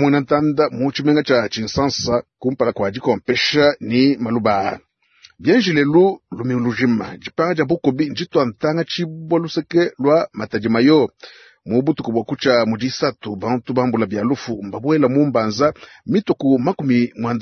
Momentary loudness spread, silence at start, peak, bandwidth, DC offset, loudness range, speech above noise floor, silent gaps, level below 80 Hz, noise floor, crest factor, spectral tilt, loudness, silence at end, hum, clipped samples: 8 LU; 0 s; -2 dBFS; 6.6 kHz; under 0.1%; 2 LU; 34 dB; none; -54 dBFS; -51 dBFS; 16 dB; -6 dB/octave; -18 LUFS; 0 s; none; under 0.1%